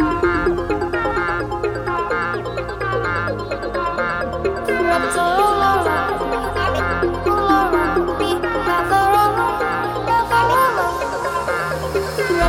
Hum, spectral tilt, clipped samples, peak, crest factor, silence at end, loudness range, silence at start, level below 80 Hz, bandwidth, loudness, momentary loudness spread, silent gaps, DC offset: none; -5.5 dB/octave; under 0.1%; -4 dBFS; 16 dB; 0 s; 4 LU; 0 s; -36 dBFS; 17 kHz; -19 LUFS; 7 LU; none; under 0.1%